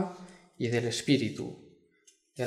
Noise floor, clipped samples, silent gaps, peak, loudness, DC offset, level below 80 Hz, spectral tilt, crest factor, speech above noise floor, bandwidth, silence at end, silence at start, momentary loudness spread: -66 dBFS; under 0.1%; none; -12 dBFS; -31 LUFS; under 0.1%; -70 dBFS; -5 dB/octave; 20 dB; 36 dB; 14 kHz; 0 s; 0 s; 24 LU